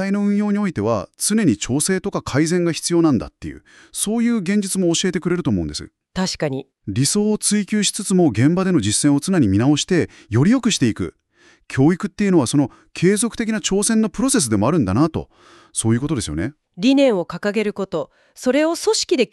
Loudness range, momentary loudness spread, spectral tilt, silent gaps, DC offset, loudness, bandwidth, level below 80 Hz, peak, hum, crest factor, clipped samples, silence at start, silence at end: 3 LU; 10 LU; -5 dB/octave; none; under 0.1%; -19 LUFS; 13.5 kHz; -46 dBFS; -4 dBFS; none; 16 dB; under 0.1%; 0 s; 0.05 s